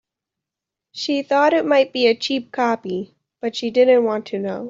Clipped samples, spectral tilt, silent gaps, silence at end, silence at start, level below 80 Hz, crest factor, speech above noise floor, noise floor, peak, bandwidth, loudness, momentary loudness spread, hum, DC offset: under 0.1%; -4.5 dB/octave; none; 0 s; 0.95 s; -70 dBFS; 16 dB; 67 dB; -86 dBFS; -4 dBFS; 7.6 kHz; -19 LUFS; 13 LU; none; under 0.1%